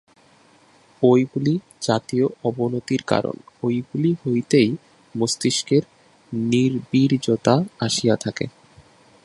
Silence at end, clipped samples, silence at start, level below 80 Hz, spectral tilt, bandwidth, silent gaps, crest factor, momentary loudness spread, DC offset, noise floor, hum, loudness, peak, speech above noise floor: 0.75 s; under 0.1%; 1 s; -60 dBFS; -5.5 dB/octave; 11.5 kHz; none; 20 dB; 9 LU; under 0.1%; -54 dBFS; none; -21 LUFS; -2 dBFS; 34 dB